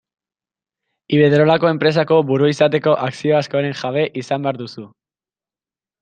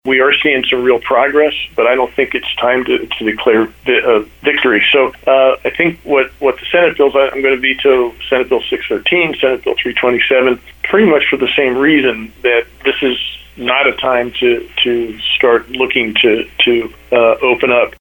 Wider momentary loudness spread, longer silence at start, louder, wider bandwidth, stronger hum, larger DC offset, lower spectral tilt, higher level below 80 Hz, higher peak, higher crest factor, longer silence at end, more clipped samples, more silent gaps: first, 9 LU vs 5 LU; first, 1.1 s vs 0.05 s; second, -16 LUFS vs -12 LUFS; second, 9.2 kHz vs 19 kHz; neither; neither; first, -7 dB/octave vs -5.5 dB/octave; second, -62 dBFS vs -44 dBFS; about the same, -2 dBFS vs 0 dBFS; about the same, 16 dB vs 12 dB; first, 1.15 s vs 0.1 s; neither; neither